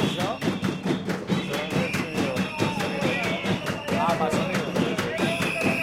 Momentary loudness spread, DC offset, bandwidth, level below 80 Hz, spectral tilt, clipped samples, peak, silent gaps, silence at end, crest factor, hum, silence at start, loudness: 3 LU; under 0.1%; 16.5 kHz; -54 dBFS; -5 dB/octave; under 0.1%; -8 dBFS; none; 0 s; 16 dB; none; 0 s; -26 LUFS